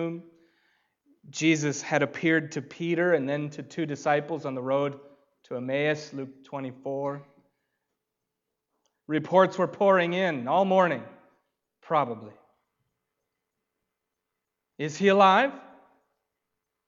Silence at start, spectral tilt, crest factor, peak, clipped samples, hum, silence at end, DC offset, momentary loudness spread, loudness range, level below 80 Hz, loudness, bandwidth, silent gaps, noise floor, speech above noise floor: 0 s; -5.5 dB/octave; 22 dB; -6 dBFS; under 0.1%; none; 1.25 s; under 0.1%; 15 LU; 11 LU; -80 dBFS; -26 LUFS; 7.6 kHz; none; -84 dBFS; 59 dB